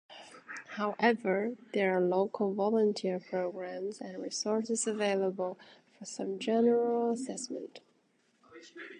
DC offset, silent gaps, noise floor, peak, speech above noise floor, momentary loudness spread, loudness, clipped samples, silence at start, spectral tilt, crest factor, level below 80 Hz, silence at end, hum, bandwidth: under 0.1%; none; -72 dBFS; -12 dBFS; 40 dB; 17 LU; -32 LUFS; under 0.1%; 0.1 s; -4.5 dB/octave; 22 dB; -86 dBFS; 0 s; none; 11 kHz